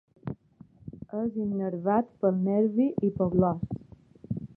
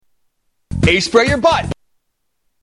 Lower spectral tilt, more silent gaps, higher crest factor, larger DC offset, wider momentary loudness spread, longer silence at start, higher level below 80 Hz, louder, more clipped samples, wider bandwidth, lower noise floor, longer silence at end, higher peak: first, -13 dB/octave vs -5 dB/octave; neither; about the same, 18 dB vs 16 dB; neither; about the same, 16 LU vs 16 LU; second, 0.25 s vs 0.7 s; second, -56 dBFS vs -34 dBFS; second, -28 LUFS vs -14 LUFS; neither; second, 3.1 kHz vs 11.5 kHz; second, -55 dBFS vs -67 dBFS; second, 0.1 s vs 0.9 s; second, -10 dBFS vs -2 dBFS